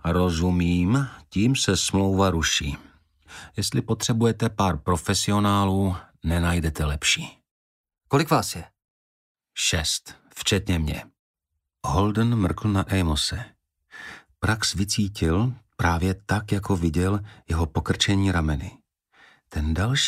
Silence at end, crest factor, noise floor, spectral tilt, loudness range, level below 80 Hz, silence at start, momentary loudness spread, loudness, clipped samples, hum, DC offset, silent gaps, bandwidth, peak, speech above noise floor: 0 s; 18 dB; -66 dBFS; -4.5 dB/octave; 3 LU; -38 dBFS; 0.05 s; 12 LU; -24 LUFS; under 0.1%; none; under 0.1%; 7.51-7.84 s, 8.90-9.35 s, 11.19-11.34 s; 15.5 kHz; -6 dBFS; 43 dB